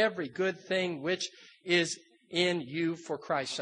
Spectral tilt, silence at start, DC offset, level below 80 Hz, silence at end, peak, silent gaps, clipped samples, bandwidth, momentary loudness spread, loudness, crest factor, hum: -4 dB/octave; 0 s; under 0.1%; -80 dBFS; 0 s; -12 dBFS; none; under 0.1%; 10 kHz; 10 LU; -32 LUFS; 20 dB; none